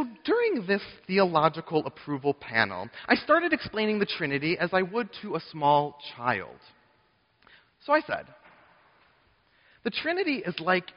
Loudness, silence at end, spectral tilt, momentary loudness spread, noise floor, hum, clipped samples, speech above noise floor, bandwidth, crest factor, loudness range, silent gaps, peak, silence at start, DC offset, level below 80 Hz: -27 LUFS; 0.15 s; -3 dB/octave; 11 LU; -67 dBFS; none; under 0.1%; 40 dB; 5.6 kHz; 22 dB; 7 LU; none; -6 dBFS; 0 s; under 0.1%; -66 dBFS